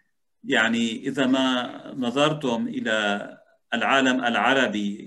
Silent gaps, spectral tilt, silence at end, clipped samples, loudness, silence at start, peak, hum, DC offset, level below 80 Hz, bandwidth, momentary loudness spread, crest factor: none; -4 dB/octave; 0 s; under 0.1%; -23 LUFS; 0.45 s; -6 dBFS; none; under 0.1%; -72 dBFS; 11.5 kHz; 10 LU; 18 dB